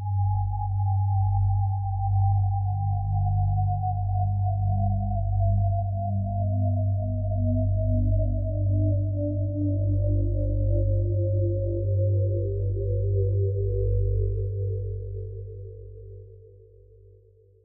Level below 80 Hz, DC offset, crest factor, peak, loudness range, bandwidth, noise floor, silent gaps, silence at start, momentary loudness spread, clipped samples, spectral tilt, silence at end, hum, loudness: -34 dBFS; under 0.1%; 10 dB; -14 dBFS; 3 LU; 0.9 kHz; -56 dBFS; none; 0 s; 6 LU; under 0.1%; -18 dB/octave; 1.25 s; none; -26 LUFS